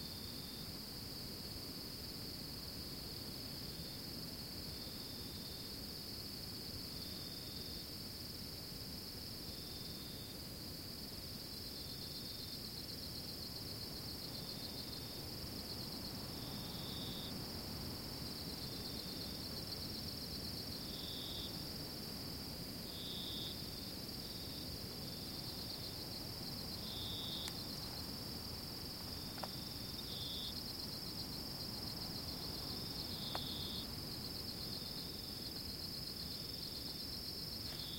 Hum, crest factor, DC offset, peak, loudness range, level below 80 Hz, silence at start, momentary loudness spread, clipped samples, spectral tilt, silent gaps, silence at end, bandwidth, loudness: none; 20 dB; under 0.1%; -26 dBFS; 3 LU; -60 dBFS; 0 s; 3 LU; under 0.1%; -3.5 dB/octave; none; 0 s; 16.5 kHz; -45 LUFS